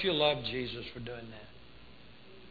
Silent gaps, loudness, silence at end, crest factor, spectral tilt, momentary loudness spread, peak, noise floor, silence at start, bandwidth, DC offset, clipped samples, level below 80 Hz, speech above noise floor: none; -34 LUFS; 0 s; 20 dB; -7 dB/octave; 26 LU; -16 dBFS; -56 dBFS; 0 s; 4.9 kHz; 0.2%; under 0.1%; -60 dBFS; 22 dB